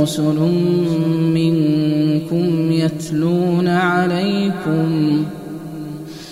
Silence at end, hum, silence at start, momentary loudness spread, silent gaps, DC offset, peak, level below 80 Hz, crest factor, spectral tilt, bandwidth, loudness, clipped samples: 0 s; none; 0 s; 13 LU; none; 0.1%; -4 dBFS; -54 dBFS; 14 dB; -7 dB/octave; 15 kHz; -17 LUFS; under 0.1%